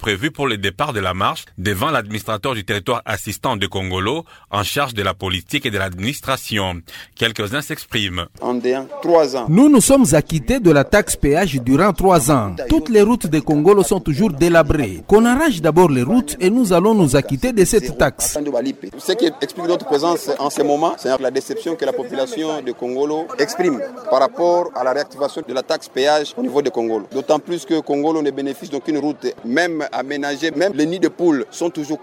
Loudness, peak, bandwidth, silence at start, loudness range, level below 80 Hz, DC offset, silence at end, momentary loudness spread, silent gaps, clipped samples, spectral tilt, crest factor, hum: -17 LUFS; -2 dBFS; 17 kHz; 0 s; 7 LU; -38 dBFS; under 0.1%; 0 s; 10 LU; none; under 0.1%; -5 dB/octave; 16 dB; none